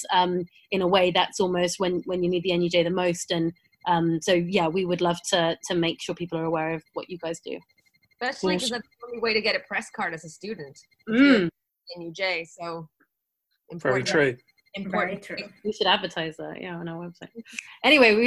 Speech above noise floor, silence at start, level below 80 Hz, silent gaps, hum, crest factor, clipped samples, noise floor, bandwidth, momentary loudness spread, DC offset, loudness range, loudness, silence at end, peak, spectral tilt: 53 dB; 0 s; -62 dBFS; none; none; 22 dB; under 0.1%; -78 dBFS; 12.5 kHz; 17 LU; under 0.1%; 5 LU; -25 LUFS; 0 s; -4 dBFS; -4.5 dB/octave